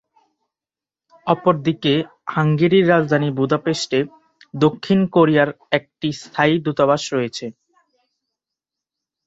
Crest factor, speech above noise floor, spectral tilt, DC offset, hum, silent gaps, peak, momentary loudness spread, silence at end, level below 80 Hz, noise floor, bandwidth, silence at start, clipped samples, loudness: 18 dB; over 72 dB; -6 dB/octave; under 0.1%; none; none; -2 dBFS; 11 LU; 1.75 s; -60 dBFS; under -90 dBFS; 8 kHz; 1.25 s; under 0.1%; -18 LUFS